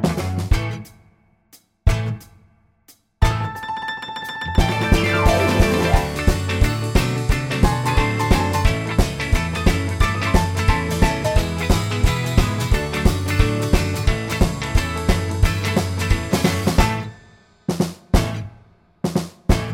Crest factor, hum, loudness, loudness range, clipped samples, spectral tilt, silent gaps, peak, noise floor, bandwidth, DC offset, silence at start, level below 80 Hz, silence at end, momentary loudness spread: 16 dB; none; -20 LUFS; 6 LU; under 0.1%; -5.5 dB/octave; none; -2 dBFS; -56 dBFS; 17 kHz; under 0.1%; 0 s; -24 dBFS; 0 s; 9 LU